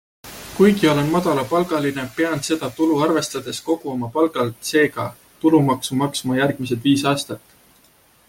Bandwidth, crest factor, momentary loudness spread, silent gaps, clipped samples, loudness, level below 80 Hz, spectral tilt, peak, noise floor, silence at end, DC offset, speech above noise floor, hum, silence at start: 17 kHz; 18 dB; 10 LU; none; under 0.1%; -20 LUFS; -56 dBFS; -5 dB/octave; -2 dBFS; -55 dBFS; 0.9 s; under 0.1%; 36 dB; none; 0.25 s